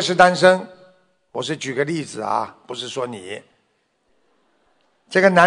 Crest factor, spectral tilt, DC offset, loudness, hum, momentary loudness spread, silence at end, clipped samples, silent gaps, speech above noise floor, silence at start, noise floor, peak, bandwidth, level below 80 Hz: 20 dB; -4.5 dB/octave; under 0.1%; -20 LUFS; none; 19 LU; 0 s; under 0.1%; none; 48 dB; 0 s; -67 dBFS; 0 dBFS; 10.5 kHz; -64 dBFS